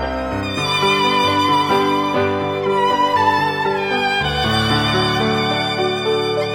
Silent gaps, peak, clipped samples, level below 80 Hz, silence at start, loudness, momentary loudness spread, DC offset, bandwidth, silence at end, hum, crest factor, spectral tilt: none; -4 dBFS; under 0.1%; -40 dBFS; 0 s; -17 LUFS; 4 LU; under 0.1%; 17.5 kHz; 0 s; none; 14 dB; -4.5 dB/octave